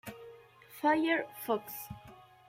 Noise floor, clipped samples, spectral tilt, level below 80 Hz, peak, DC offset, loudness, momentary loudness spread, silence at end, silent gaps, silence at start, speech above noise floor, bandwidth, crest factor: -55 dBFS; under 0.1%; -4.5 dB/octave; -68 dBFS; -16 dBFS; under 0.1%; -33 LUFS; 22 LU; 0.25 s; none; 0.05 s; 23 dB; 16.5 kHz; 18 dB